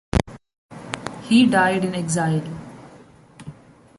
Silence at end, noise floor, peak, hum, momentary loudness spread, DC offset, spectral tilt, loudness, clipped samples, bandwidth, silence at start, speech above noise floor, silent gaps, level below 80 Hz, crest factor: 0.45 s; -48 dBFS; -2 dBFS; none; 25 LU; under 0.1%; -5 dB/octave; -20 LUFS; under 0.1%; 11.5 kHz; 0.15 s; 29 dB; 0.58-0.69 s; -40 dBFS; 20 dB